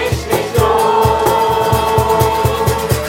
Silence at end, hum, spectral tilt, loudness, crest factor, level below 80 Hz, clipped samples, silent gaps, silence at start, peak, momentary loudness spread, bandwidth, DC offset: 0 s; none; -5 dB/octave; -13 LUFS; 12 dB; -30 dBFS; under 0.1%; none; 0 s; 0 dBFS; 4 LU; 16.5 kHz; under 0.1%